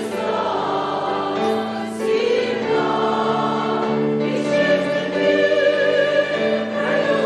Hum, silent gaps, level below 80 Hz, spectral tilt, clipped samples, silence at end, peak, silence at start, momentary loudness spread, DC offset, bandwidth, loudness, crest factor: none; none; -62 dBFS; -5.5 dB/octave; under 0.1%; 0 s; -6 dBFS; 0 s; 5 LU; under 0.1%; 12 kHz; -19 LUFS; 14 dB